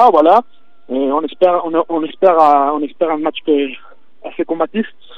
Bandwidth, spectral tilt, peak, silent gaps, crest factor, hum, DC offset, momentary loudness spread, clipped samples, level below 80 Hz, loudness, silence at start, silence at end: 6.4 kHz; -7 dB/octave; 0 dBFS; none; 14 dB; none; 2%; 13 LU; under 0.1%; -66 dBFS; -15 LUFS; 0 s; 0.3 s